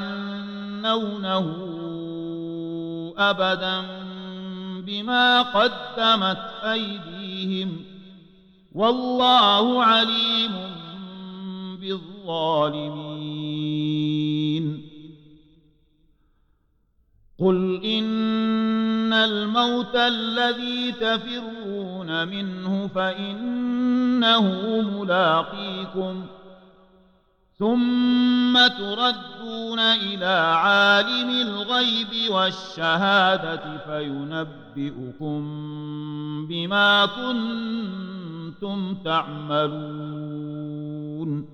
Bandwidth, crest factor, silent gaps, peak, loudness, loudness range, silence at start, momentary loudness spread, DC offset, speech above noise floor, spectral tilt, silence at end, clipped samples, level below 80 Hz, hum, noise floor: 7.6 kHz; 18 dB; none; -6 dBFS; -22 LUFS; 8 LU; 0 s; 15 LU; under 0.1%; 42 dB; -5.5 dB/octave; 0 s; under 0.1%; -62 dBFS; none; -65 dBFS